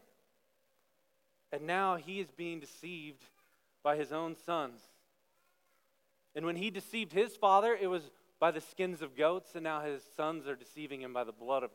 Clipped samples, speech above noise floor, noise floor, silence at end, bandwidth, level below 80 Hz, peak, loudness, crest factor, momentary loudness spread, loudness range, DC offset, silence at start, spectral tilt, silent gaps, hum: under 0.1%; 42 dB; -78 dBFS; 0.05 s; 16.5 kHz; under -90 dBFS; -14 dBFS; -36 LUFS; 22 dB; 14 LU; 8 LU; under 0.1%; 1.5 s; -5 dB/octave; none; none